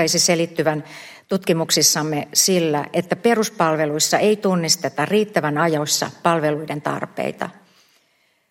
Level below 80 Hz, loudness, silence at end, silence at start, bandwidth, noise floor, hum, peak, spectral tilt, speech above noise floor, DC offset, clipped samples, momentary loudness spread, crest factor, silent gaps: -66 dBFS; -19 LUFS; 1 s; 0 s; 16.5 kHz; -63 dBFS; none; -2 dBFS; -3 dB/octave; 43 dB; under 0.1%; under 0.1%; 10 LU; 18 dB; none